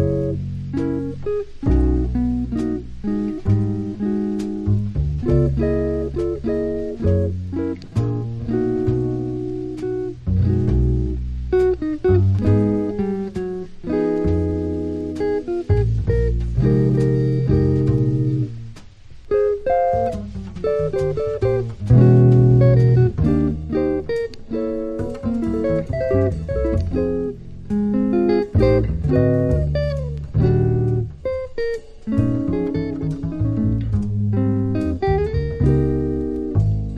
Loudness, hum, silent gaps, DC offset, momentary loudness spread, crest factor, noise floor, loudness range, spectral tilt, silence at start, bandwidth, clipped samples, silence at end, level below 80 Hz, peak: -20 LUFS; none; none; under 0.1%; 9 LU; 18 dB; -39 dBFS; 6 LU; -10 dB/octave; 0 s; 7.2 kHz; under 0.1%; 0 s; -30 dBFS; -2 dBFS